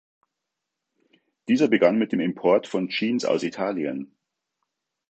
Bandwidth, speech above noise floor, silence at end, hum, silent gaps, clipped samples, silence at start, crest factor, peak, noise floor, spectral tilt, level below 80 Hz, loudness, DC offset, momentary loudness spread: 8.4 kHz; 61 dB; 1.05 s; none; none; under 0.1%; 1.5 s; 20 dB; -4 dBFS; -83 dBFS; -5.5 dB/octave; -74 dBFS; -23 LUFS; under 0.1%; 12 LU